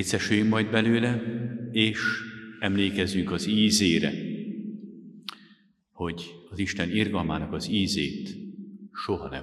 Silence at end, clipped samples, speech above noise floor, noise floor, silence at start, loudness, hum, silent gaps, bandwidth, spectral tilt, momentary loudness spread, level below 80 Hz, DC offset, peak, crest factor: 0 s; under 0.1%; 34 dB; -60 dBFS; 0 s; -26 LUFS; none; none; 13 kHz; -4.5 dB/octave; 17 LU; -56 dBFS; under 0.1%; -6 dBFS; 22 dB